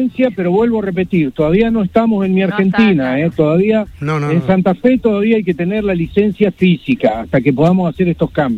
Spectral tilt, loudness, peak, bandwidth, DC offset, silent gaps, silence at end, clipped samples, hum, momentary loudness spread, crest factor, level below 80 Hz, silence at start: -9 dB/octave; -14 LUFS; 0 dBFS; 7.2 kHz; under 0.1%; none; 0 s; under 0.1%; none; 4 LU; 12 dB; -40 dBFS; 0 s